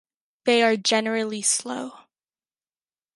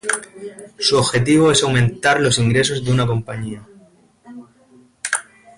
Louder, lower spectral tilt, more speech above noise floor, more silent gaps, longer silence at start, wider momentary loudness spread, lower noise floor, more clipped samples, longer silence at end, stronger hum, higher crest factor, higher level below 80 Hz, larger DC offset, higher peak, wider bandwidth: second, -22 LUFS vs -17 LUFS; second, -1.5 dB/octave vs -4.5 dB/octave; first, over 67 dB vs 34 dB; neither; first, 0.45 s vs 0.05 s; second, 14 LU vs 17 LU; first, under -90 dBFS vs -51 dBFS; neither; first, 1.15 s vs 0.35 s; neither; first, 20 dB vs 14 dB; second, -80 dBFS vs -46 dBFS; neither; about the same, -6 dBFS vs -4 dBFS; about the same, 11.5 kHz vs 11.5 kHz